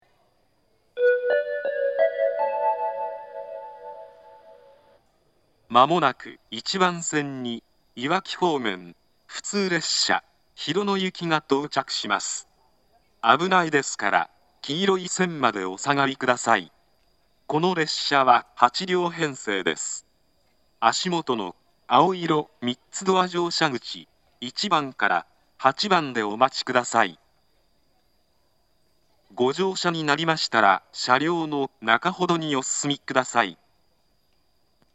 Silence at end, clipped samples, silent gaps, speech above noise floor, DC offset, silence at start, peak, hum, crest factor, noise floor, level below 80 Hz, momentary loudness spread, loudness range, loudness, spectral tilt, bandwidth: 1.4 s; under 0.1%; none; 45 dB; under 0.1%; 0.95 s; 0 dBFS; none; 24 dB; -68 dBFS; -72 dBFS; 13 LU; 5 LU; -23 LUFS; -3.5 dB/octave; 8.8 kHz